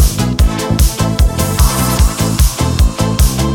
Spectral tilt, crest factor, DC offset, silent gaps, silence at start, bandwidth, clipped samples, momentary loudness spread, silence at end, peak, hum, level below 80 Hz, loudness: -5 dB/octave; 12 dB; 0.7%; none; 0 s; 18.5 kHz; under 0.1%; 1 LU; 0 s; 0 dBFS; none; -14 dBFS; -13 LUFS